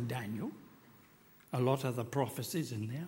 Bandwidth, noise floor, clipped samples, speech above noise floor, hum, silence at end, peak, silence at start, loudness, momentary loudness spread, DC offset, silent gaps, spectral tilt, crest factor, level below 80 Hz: 16.5 kHz; -62 dBFS; under 0.1%; 26 dB; none; 0 s; -18 dBFS; 0 s; -37 LUFS; 9 LU; under 0.1%; none; -6 dB/octave; 20 dB; -74 dBFS